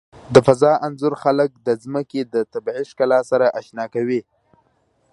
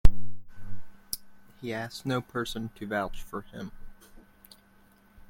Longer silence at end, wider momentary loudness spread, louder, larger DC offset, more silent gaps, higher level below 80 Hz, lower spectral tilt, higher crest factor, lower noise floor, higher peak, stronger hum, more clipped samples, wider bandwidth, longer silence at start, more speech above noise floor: second, 0.9 s vs 1.35 s; second, 11 LU vs 23 LU; first, -19 LUFS vs -35 LUFS; neither; neither; second, -58 dBFS vs -34 dBFS; first, -6.5 dB/octave vs -5 dB/octave; about the same, 20 dB vs 24 dB; about the same, -63 dBFS vs -60 dBFS; about the same, 0 dBFS vs -2 dBFS; neither; neither; second, 11.5 kHz vs 16.5 kHz; first, 0.3 s vs 0.05 s; first, 45 dB vs 26 dB